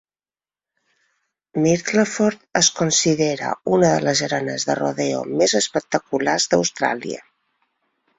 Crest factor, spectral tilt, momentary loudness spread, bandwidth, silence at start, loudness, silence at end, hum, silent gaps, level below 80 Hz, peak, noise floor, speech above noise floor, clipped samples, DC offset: 18 dB; -3.5 dB/octave; 7 LU; 8.4 kHz; 1.55 s; -19 LUFS; 1 s; none; none; -60 dBFS; -2 dBFS; under -90 dBFS; over 70 dB; under 0.1%; under 0.1%